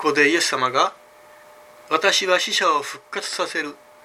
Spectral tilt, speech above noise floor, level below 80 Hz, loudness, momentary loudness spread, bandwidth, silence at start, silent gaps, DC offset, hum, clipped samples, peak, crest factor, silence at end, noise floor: -1.5 dB/octave; 27 dB; -74 dBFS; -20 LUFS; 11 LU; 16 kHz; 0 s; none; under 0.1%; none; under 0.1%; -2 dBFS; 20 dB; 0.3 s; -48 dBFS